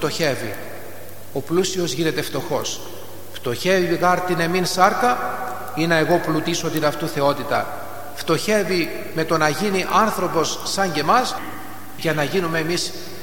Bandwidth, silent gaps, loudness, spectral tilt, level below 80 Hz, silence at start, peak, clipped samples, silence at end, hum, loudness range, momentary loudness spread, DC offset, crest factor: 17.5 kHz; none; -21 LUFS; -4 dB/octave; -56 dBFS; 0 s; 0 dBFS; under 0.1%; 0 s; none; 3 LU; 14 LU; 3%; 20 dB